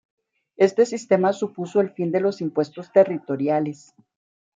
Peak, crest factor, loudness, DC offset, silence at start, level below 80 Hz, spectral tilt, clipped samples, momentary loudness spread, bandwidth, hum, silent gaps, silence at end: -4 dBFS; 18 dB; -22 LUFS; under 0.1%; 0.6 s; -74 dBFS; -6.5 dB/octave; under 0.1%; 7 LU; 7.8 kHz; none; none; 0.85 s